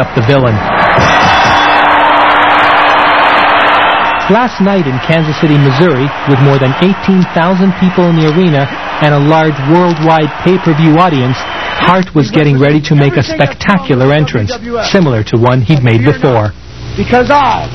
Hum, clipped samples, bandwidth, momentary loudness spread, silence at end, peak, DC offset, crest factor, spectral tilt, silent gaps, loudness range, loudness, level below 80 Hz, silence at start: none; 0.7%; 6.4 kHz; 6 LU; 0 s; 0 dBFS; 2%; 8 dB; -6.5 dB/octave; none; 3 LU; -8 LUFS; -34 dBFS; 0 s